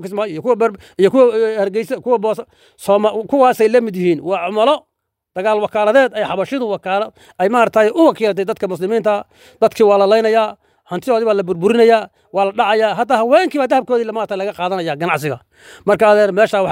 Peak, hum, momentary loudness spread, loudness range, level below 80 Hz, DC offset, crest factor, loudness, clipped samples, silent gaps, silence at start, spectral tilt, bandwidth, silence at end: 0 dBFS; none; 9 LU; 2 LU; -62 dBFS; under 0.1%; 14 dB; -15 LUFS; under 0.1%; none; 0 s; -5.5 dB/octave; 16 kHz; 0 s